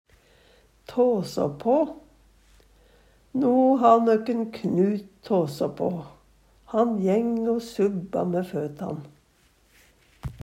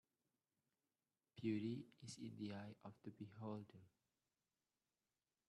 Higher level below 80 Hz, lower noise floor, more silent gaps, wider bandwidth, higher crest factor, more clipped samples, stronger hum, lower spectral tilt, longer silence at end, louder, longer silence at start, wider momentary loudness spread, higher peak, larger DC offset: first, -58 dBFS vs -88 dBFS; second, -62 dBFS vs under -90 dBFS; neither; first, 16 kHz vs 12 kHz; about the same, 20 dB vs 22 dB; neither; neither; first, -8 dB/octave vs -6.5 dB/octave; second, 0.05 s vs 1.6 s; first, -24 LUFS vs -52 LUFS; second, 0.9 s vs 1.35 s; about the same, 14 LU vs 15 LU; first, -6 dBFS vs -32 dBFS; neither